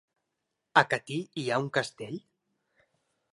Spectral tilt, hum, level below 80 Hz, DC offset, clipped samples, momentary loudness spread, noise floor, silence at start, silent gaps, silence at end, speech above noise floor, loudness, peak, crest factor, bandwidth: -4.5 dB/octave; none; -76 dBFS; under 0.1%; under 0.1%; 16 LU; -83 dBFS; 0.75 s; none; 1.15 s; 54 dB; -29 LUFS; -4 dBFS; 28 dB; 11.5 kHz